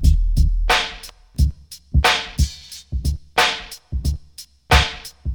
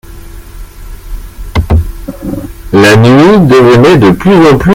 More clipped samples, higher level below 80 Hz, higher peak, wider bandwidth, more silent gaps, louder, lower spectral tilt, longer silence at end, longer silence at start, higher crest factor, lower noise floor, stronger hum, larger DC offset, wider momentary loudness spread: second, under 0.1% vs 4%; about the same, -22 dBFS vs -22 dBFS; about the same, 0 dBFS vs 0 dBFS; first, over 20 kHz vs 17 kHz; neither; second, -20 LUFS vs -5 LUFS; second, -4 dB/octave vs -7 dB/octave; about the same, 0 s vs 0 s; about the same, 0 s vs 0.1 s; first, 20 dB vs 6 dB; first, -43 dBFS vs -26 dBFS; neither; neither; second, 17 LU vs 20 LU